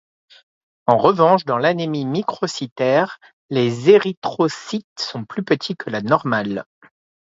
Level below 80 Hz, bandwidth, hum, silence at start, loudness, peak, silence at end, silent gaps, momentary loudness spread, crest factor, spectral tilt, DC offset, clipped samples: -62 dBFS; 7.8 kHz; none; 0.85 s; -19 LUFS; 0 dBFS; 0.6 s; 2.72-2.76 s, 3.33-3.49 s, 4.17-4.22 s, 4.84-4.96 s; 13 LU; 20 dB; -6 dB/octave; under 0.1%; under 0.1%